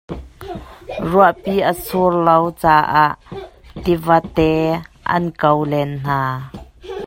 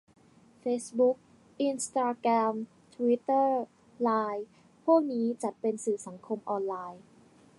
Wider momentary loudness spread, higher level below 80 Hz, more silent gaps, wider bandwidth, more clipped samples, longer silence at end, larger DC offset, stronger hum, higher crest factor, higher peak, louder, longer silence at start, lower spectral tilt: first, 19 LU vs 13 LU; first, -40 dBFS vs -80 dBFS; neither; first, 16.5 kHz vs 11.5 kHz; neither; second, 0 s vs 0.6 s; neither; neither; about the same, 18 dB vs 18 dB; first, 0 dBFS vs -12 dBFS; first, -16 LUFS vs -30 LUFS; second, 0.1 s vs 0.65 s; first, -7 dB/octave vs -5 dB/octave